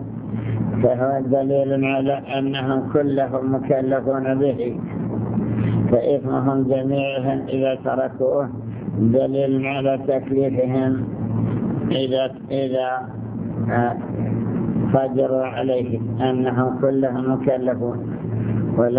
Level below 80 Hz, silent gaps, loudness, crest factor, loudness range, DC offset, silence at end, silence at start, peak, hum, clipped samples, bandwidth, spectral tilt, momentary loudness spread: -48 dBFS; none; -21 LUFS; 18 dB; 2 LU; under 0.1%; 0 s; 0 s; -2 dBFS; none; under 0.1%; 4 kHz; -12 dB/octave; 6 LU